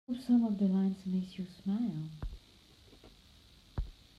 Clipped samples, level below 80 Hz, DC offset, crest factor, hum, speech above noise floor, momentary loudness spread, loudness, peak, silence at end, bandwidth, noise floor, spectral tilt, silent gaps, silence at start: under 0.1%; -50 dBFS; under 0.1%; 16 dB; none; 28 dB; 17 LU; -34 LUFS; -20 dBFS; 0.25 s; 10.5 kHz; -61 dBFS; -8.5 dB/octave; none; 0.1 s